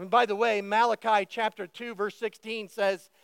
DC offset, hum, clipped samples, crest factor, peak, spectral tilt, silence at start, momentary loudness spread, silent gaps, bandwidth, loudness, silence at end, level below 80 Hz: under 0.1%; none; under 0.1%; 18 dB; -10 dBFS; -4 dB/octave; 0 s; 12 LU; none; 16.5 kHz; -28 LUFS; 0.25 s; -90 dBFS